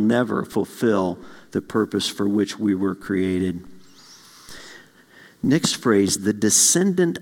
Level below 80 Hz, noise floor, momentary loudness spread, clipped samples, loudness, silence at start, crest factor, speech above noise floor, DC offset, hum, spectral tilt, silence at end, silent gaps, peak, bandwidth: -62 dBFS; -50 dBFS; 16 LU; under 0.1%; -21 LUFS; 0 s; 18 dB; 29 dB; under 0.1%; none; -4 dB/octave; 0 s; none; -4 dBFS; 18 kHz